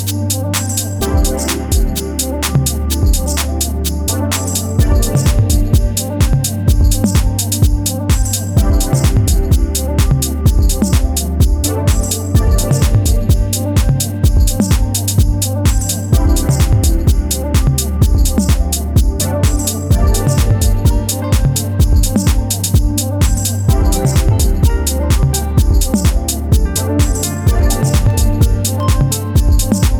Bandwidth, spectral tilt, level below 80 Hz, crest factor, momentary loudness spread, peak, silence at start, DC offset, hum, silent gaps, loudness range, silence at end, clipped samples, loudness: over 20 kHz; -5 dB/octave; -16 dBFS; 12 dB; 3 LU; 0 dBFS; 0 s; under 0.1%; none; none; 1 LU; 0 s; under 0.1%; -14 LUFS